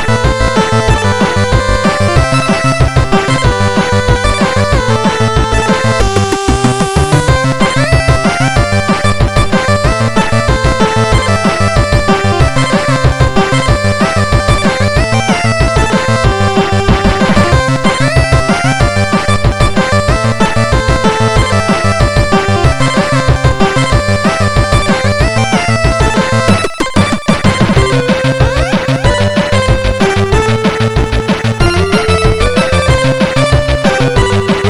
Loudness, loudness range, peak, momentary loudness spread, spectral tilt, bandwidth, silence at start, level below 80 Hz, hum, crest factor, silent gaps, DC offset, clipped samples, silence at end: -10 LUFS; 1 LU; 0 dBFS; 2 LU; -5.5 dB/octave; 12.5 kHz; 0 s; -18 dBFS; none; 10 dB; none; under 0.1%; 0.3%; 0 s